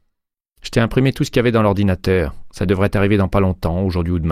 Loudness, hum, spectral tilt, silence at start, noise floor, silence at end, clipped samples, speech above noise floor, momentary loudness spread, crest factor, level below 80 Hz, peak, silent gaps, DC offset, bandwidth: -18 LUFS; none; -7 dB/octave; 0.65 s; -75 dBFS; 0 s; under 0.1%; 59 dB; 5 LU; 14 dB; -32 dBFS; -2 dBFS; none; under 0.1%; 15 kHz